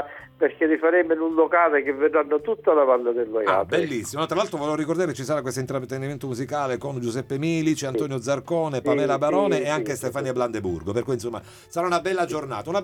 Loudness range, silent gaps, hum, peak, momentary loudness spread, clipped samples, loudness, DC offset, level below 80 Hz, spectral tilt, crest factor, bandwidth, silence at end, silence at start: 6 LU; none; none; -6 dBFS; 9 LU; under 0.1%; -24 LUFS; under 0.1%; -60 dBFS; -5.5 dB/octave; 18 dB; 17 kHz; 0 s; 0 s